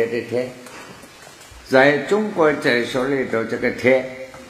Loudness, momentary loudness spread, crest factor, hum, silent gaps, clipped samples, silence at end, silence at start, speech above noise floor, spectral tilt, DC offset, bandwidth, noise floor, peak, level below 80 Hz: -19 LUFS; 19 LU; 20 dB; none; none; under 0.1%; 0 s; 0 s; 24 dB; -5 dB/octave; under 0.1%; 15 kHz; -42 dBFS; 0 dBFS; -54 dBFS